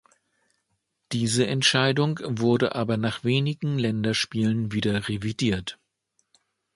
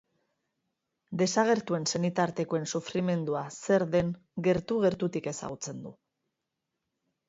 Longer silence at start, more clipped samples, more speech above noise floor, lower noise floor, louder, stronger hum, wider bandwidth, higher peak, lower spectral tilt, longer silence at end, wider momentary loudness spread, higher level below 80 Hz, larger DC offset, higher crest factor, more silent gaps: about the same, 1.1 s vs 1.1 s; neither; second, 52 dB vs 56 dB; second, -76 dBFS vs -85 dBFS; first, -24 LUFS vs -29 LUFS; neither; first, 11.5 kHz vs 8 kHz; first, -6 dBFS vs -10 dBFS; about the same, -5 dB/octave vs -5 dB/octave; second, 1 s vs 1.35 s; second, 7 LU vs 11 LU; first, -54 dBFS vs -62 dBFS; neither; about the same, 20 dB vs 20 dB; neither